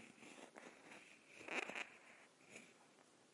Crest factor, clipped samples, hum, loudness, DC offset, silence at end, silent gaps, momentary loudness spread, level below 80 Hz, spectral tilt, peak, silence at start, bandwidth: 26 dB; under 0.1%; none; -52 LUFS; under 0.1%; 0 s; none; 20 LU; under -90 dBFS; -2 dB/octave; -28 dBFS; 0 s; 12 kHz